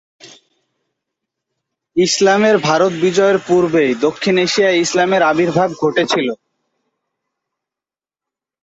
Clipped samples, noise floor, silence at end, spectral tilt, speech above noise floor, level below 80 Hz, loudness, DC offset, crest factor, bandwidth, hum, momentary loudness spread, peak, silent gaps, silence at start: under 0.1%; -89 dBFS; 2.3 s; -4 dB/octave; 76 dB; -58 dBFS; -14 LUFS; under 0.1%; 16 dB; 8 kHz; none; 5 LU; -2 dBFS; none; 0.25 s